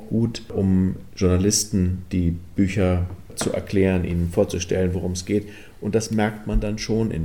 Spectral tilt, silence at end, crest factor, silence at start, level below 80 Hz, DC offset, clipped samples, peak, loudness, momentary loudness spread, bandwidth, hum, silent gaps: -5.5 dB/octave; 0 s; 16 dB; 0 s; -36 dBFS; 0.7%; under 0.1%; -6 dBFS; -23 LUFS; 6 LU; 18 kHz; none; none